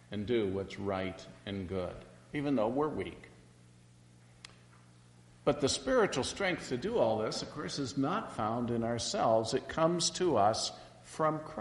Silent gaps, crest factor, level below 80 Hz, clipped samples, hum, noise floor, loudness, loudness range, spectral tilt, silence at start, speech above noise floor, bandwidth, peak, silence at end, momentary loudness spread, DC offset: none; 20 dB; -62 dBFS; under 0.1%; none; -59 dBFS; -33 LUFS; 7 LU; -4.5 dB/octave; 0.1 s; 27 dB; 11.5 kHz; -14 dBFS; 0 s; 14 LU; under 0.1%